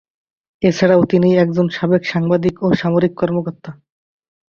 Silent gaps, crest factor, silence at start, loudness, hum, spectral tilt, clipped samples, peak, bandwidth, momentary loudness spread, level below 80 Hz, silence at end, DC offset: none; 16 dB; 0.6 s; -16 LUFS; none; -7.5 dB/octave; under 0.1%; -2 dBFS; 7 kHz; 9 LU; -52 dBFS; 0.75 s; under 0.1%